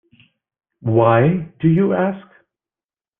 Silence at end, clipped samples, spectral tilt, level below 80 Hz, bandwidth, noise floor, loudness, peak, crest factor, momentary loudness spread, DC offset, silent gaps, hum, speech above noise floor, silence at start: 1 s; under 0.1%; -12 dB/octave; -54 dBFS; 3.7 kHz; under -90 dBFS; -17 LUFS; -2 dBFS; 16 dB; 11 LU; under 0.1%; none; none; over 75 dB; 0.85 s